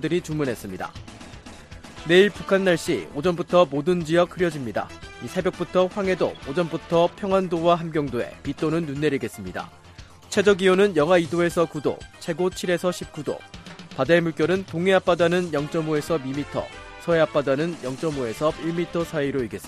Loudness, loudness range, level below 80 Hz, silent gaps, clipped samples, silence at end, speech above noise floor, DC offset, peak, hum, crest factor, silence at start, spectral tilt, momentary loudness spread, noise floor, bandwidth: -23 LUFS; 3 LU; -50 dBFS; none; under 0.1%; 0 s; 23 dB; under 0.1%; -4 dBFS; none; 20 dB; 0 s; -5.5 dB/octave; 15 LU; -45 dBFS; 14.5 kHz